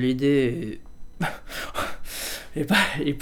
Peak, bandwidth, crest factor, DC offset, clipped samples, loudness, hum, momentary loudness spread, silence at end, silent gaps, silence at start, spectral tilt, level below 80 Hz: -6 dBFS; 19.5 kHz; 18 dB; under 0.1%; under 0.1%; -25 LUFS; none; 12 LU; 0 s; none; 0 s; -4.5 dB/octave; -42 dBFS